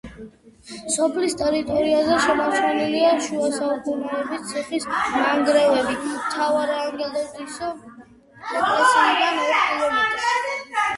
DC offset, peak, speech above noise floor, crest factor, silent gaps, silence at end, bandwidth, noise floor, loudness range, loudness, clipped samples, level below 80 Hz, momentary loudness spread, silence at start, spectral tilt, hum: under 0.1%; -4 dBFS; 26 dB; 16 dB; none; 0 s; 11.5 kHz; -47 dBFS; 2 LU; -21 LUFS; under 0.1%; -54 dBFS; 11 LU; 0.05 s; -2.5 dB/octave; none